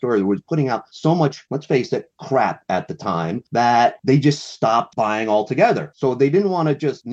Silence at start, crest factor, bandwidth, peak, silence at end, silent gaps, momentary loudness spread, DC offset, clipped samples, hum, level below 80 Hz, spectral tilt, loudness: 0 s; 16 dB; 8.2 kHz; -4 dBFS; 0 s; none; 7 LU; under 0.1%; under 0.1%; none; -62 dBFS; -6.5 dB/octave; -19 LUFS